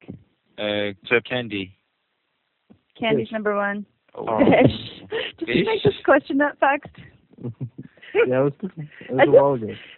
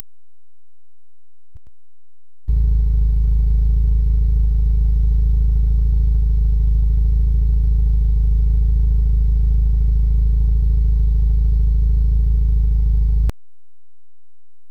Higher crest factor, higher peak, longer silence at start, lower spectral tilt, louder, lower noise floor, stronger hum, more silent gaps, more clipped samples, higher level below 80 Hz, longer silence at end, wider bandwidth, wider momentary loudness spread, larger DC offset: first, 22 dB vs 10 dB; first, 0 dBFS vs -6 dBFS; second, 0.1 s vs 2.5 s; second, -4 dB/octave vs -10.5 dB/octave; second, -21 LUFS vs -18 LUFS; second, -73 dBFS vs -79 dBFS; neither; neither; neither; second, -58 dBFS vs -16 dBFS; second, 0.05 s vs 1.4 s; first, 4.4 kHz vs 0.8 kHz; first, 18 LU vs 0 LU; second, under 0.1% vs 3%